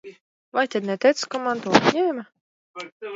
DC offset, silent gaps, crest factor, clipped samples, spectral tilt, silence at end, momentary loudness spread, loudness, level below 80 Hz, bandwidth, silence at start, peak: under 0.1%; 0.21-0.52 s, 2.41-2.74 s, 2.92-3.00 s; 24 dB; under 0.1%; -4.5 dB/octave; 0 s; 19 LU; -22 LUFS; -62 dBFS; 8 kHz; 0.05 s; 0 dBFS